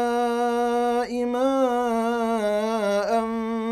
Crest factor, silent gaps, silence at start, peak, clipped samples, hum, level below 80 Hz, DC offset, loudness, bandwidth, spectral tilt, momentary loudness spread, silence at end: 12 dB; none; 0 s; -10 dBFS; under 0.1%; none; -58 dBFS; under 0.1%; -23 LUFS; 14.5 kHz; -5 dB/octave; 3 LU; 0 s